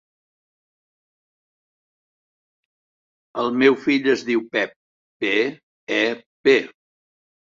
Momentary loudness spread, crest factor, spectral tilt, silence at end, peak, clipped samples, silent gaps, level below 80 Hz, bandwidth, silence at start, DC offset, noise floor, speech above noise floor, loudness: 11 LU; 22 dB; -4.5 dB/octave; 0.9 s; -2 dBFS; under 0.1%; 4.76-5.20 s, 5.63-5.87 s, 6.26-6.44 s; -70 dBFS; 7.6 kHz; 3.35 s; under 0.1%; under -90 dBFS; over 71 dB; -20 LUFS